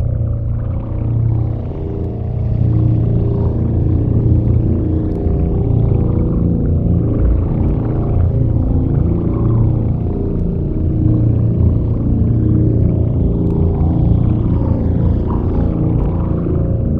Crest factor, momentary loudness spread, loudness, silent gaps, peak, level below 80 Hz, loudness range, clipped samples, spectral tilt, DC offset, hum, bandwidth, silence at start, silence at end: 14 dB; 5 LU; -16 LUFS; none; 0 dBFS; -20 dBFS; 2 LU; under 0.1%; -13.5 dB/octave; under 0.1%; none; 2.8 kHz; 0 s; 0 s